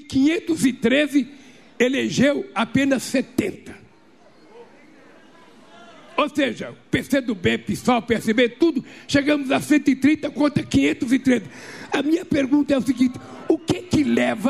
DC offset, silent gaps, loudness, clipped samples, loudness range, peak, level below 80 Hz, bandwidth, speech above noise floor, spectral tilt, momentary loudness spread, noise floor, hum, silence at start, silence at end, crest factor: 0.2%; none; -21 LUFS; under 0.1%; 8 LU; -4 dBFS; -52 dBFS; 14.5 kHz; 32 dB; -5 dB/octave; 7 LU; -53 dBFS; none; 0 s; 0 s; 16 dB